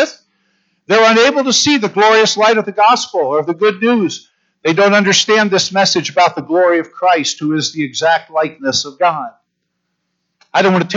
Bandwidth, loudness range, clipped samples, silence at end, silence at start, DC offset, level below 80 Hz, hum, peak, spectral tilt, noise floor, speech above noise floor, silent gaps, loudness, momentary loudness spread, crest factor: 8 kHz; 5 LU; under 0.1%; 0 s; 0 s; under 0.1%; -66 dBFS; none; 0 dBFS; -3 dB/octave; -71 dBFS; 58 dB; none; -13 LUFS; 8 LU; 14 dB